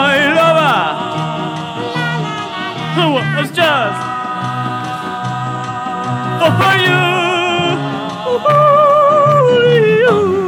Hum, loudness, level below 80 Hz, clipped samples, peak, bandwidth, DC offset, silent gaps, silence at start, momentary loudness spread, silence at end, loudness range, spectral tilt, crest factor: none; -13 LUFS; -54 dBFS; under 0.1%; 0 dBFS; 18.5 kHz; under 0.1%; none; 0 s; 11 LU; 0 s; 6 LU; -5.5 dB/octave; 12 dB